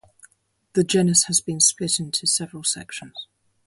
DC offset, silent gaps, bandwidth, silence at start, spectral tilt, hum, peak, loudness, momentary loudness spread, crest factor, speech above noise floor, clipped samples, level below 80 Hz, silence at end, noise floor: under 0.1%; none; 12 kHz; 0.75 s; -3 dB/octave; none; -4 dBFS; -20 LUFS; 17 LU; 20 dB; 39 dB; under 0.1%; -62 dBFS; 0.45 s; -61 dBFS